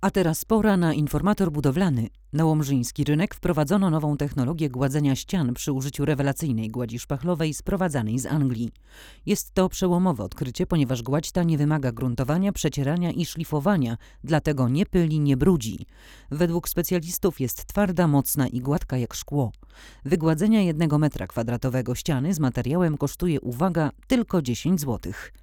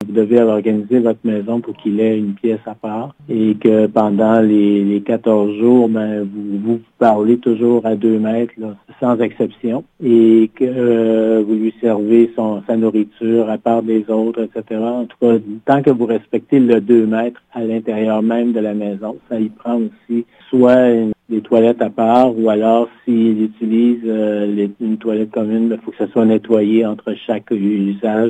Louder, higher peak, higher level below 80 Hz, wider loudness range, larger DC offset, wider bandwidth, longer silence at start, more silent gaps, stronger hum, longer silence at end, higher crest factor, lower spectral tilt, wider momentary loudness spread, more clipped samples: second, -24 LUFS vs -15 LUFS; second, -6 dBFS vs 0 dBFS; first, -42 dBFS vs -64 dBFS; about the same, 2 LU vs 3 LU; neither; first, 18.5 kHz vs 8 kHz; about the same, 0 s vs 0 s; neither; neither; first, 0.15 s vs 0 s; about the same, 16 dB vs 14 dB; second, -6.5 dB/octave vs -9 dB/octave; second, 7 LU vs 10 LU; neither